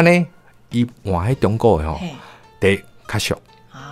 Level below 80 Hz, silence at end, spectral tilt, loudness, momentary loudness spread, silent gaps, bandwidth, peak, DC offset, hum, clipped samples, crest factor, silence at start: -38 dBFS; 0 s; -6 dB/octave; -20 LUFS; 12 LU; none; 15.5 kHz; 0 dBFS; under 0.1%; none; under 0.1%; 20 dB; 0 s